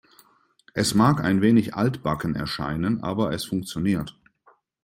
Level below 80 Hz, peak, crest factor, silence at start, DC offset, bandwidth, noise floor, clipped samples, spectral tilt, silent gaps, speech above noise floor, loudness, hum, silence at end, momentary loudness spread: -52 dBFS; -4 dBFS; 20 dB; 0.75 s; under 0.1%; 16.5 kHz; -61 dBFS; under 0.1%; -6 dB/octave; none; 38 dB; -24 LUFS; none; 0.75 s; 9 LU